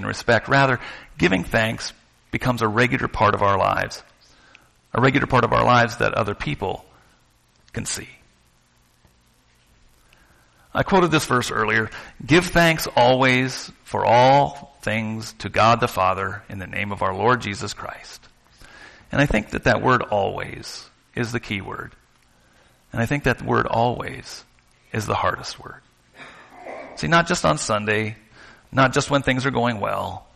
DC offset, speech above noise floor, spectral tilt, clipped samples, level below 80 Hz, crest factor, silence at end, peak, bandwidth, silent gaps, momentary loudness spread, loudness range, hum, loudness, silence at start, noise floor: under 0.1%; 39 dB; -5 dB/octave; under 0.1%; -44 dBFS; 16 dB; 0.15 s; -6 dBFS; 13 kHz; none; 17 LU; 10 LU; none; -21 LUFS; 0 s; -59 dBFS